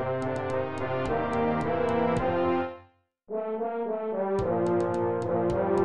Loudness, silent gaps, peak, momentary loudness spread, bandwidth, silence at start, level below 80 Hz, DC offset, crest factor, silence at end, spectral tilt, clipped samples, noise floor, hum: -28 LUFS; none; -14 dBFS; 5 LU; 10 kHz; 0 s; -50 dBFS; under 0.1%; 14 dB; 0 s; -8 dB/octave; under 0.1%; -59 dBFS; none